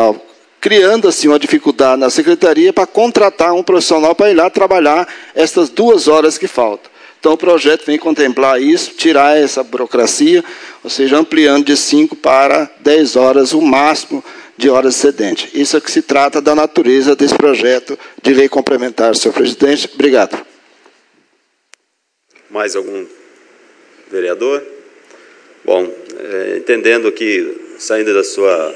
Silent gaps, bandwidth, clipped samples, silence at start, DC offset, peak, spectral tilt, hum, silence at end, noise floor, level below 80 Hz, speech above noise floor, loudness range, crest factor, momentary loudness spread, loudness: none; 11 kHz; 0.8%; 0 s; under 0.1%; 0 dBFS; -3 dB/octave; none; 0 s; -66 dBFS; -56 dBFS; 55 dB; 11 LU; 12 dB; 10 LU; -11 LUFS